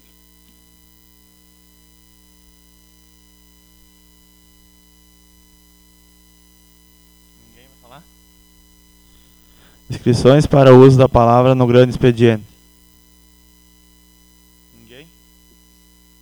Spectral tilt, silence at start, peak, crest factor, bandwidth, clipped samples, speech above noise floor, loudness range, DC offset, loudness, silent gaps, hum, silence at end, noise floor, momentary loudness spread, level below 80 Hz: -7.5 dB/octave; 9.9 s; 0 dBFS; 18 dB; over 20 kHz; 0.2%; 41 dB; 11 LU; under 0.1%; -11 LUFS; none; 60 Hz at -50 dBFS; 3.8 s; -50 dBFS; 13 LU; -40 dBFS